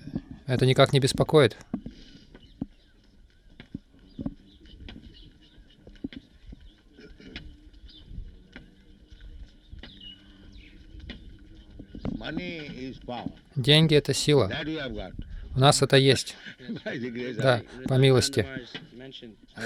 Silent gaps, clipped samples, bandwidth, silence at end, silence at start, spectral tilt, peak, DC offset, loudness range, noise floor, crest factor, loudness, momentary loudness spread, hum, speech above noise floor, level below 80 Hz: none; under 0.1%; 14.5 kHz; 0 s; 0.05 s; -5 dB/octave; -6 dBFS; under 0.1%; 24 LU; -57 dBFS; 22 dB; -24 LUFS; 26 LU; none; 33 dB; -48 dBFS